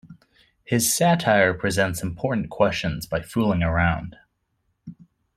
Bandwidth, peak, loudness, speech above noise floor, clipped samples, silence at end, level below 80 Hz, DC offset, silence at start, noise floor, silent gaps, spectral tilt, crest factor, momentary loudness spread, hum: 16 kHz; -4 dBFS; -22 LUFS; 51 dB; under 0.1%; 0.45 s; -44 dBFS; under 0.1%; 0.1 s; -72 dBFS; none; -4.5 dB/octave; 20 dB; 9 LU; none